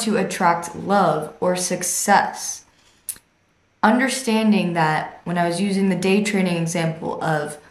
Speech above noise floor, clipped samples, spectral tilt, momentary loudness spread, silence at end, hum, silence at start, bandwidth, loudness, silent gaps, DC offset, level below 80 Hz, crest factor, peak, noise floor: 42 dB; under 0.1%; -4.5 dB/octave; 11 LU; 0.1 s; none; 0 s; 15 kHz; -20 LUFS; none; under 0.1%; -64 dBFS; 20 dB; -2 dBFS; -62 dBFS